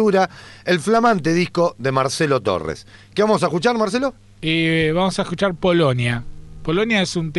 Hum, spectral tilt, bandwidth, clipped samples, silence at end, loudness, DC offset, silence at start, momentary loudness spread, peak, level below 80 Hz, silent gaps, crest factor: none; -5.5 dB/octave; 11.5 kHz; under 0.1%; 0 s; -19 LUFS; under 0.1%; 0 s; 10 LU; -4 dBFS; -44 dBFS; none; 14 dB